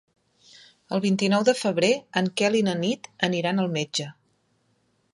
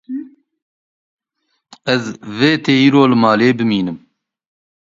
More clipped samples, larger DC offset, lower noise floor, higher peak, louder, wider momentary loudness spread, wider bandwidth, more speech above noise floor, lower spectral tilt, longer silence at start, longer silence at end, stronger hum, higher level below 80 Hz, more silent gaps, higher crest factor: neither; neither; about the same, -68 dBFS vs -70 dBFS; second, -4 dBFS vs 0 dBFS; second, -24 LUFS vs -14 LUFS; second, 8 LU vs 17 LU; first, 11.5 kHz vs 7.6 kHz; second, 45 dB vs 56 dB; about the same, -5 dB/octave vs -6 dB/octave; first, 0.9 s vs 0.1 s; about the same, 1 s vs 0.9 s; neither; second, -70 dBFS vs -58 dBFS; second, none vs 0.62-1.18 s; about the same, 20 dB vs 16 dB